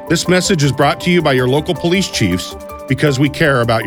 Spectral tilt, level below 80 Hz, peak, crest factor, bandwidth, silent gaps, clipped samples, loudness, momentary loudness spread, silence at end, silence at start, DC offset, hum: -5 dB/octave; -38 dBFS; 0 dBFS; 14 dB; over 20 kHz; none; under 0.1%; -14 LUFS; 7 LU; 0 s; 0 s; under 0.1%; none